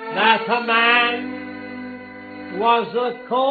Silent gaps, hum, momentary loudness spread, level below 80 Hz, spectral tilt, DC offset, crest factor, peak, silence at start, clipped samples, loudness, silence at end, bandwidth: none; none; 19 LU; -66 dBFS; -6.5 dB/octave; under 0.1%; 20 dB; 0 dBFS; 0 s; under 0.1%; -18 LUFS; 0 s; 4.8 kHz